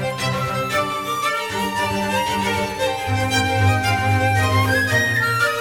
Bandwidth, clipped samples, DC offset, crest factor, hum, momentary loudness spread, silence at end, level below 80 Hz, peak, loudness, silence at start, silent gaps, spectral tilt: 19 kHz; under 0.1%; under 0.1%; 14 dB; none; 5 LU; 0 s; -46 dBFS; -4 dBFS; -19 LUFS; 0 s; none; -4.5 dB/octave